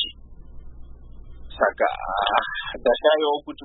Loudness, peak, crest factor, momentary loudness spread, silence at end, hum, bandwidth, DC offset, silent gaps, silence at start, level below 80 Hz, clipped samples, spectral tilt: -22 LUFS; -2 dBFS; 22 dB; 9 LU; 0 s; none; 4.1 kHz; under 0.1%; none; 0 s; -44 dBFS; under 0.1%; -8 dB/octave